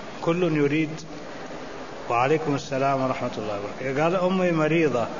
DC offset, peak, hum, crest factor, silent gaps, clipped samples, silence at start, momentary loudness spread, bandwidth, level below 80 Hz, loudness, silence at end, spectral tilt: 0.8%; -10 dBFS; none; 14 dB; none; under 0.1%; 0 s; 15 LU; 7.4 kHz; -56 dBFS; -24 LUFS; 0 s; -6.5 dB/octave